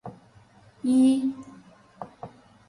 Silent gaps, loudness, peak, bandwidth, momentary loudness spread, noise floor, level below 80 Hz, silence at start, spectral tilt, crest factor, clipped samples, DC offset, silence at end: none; -23 LUFS; -12 dBFS; 11.5 kHz; 25 LU; -55 dBFS; -68 dBFS; 0.05 s; -6 dB/octave; 16 dB; under 0.1%; under 0.1%; 0.4 s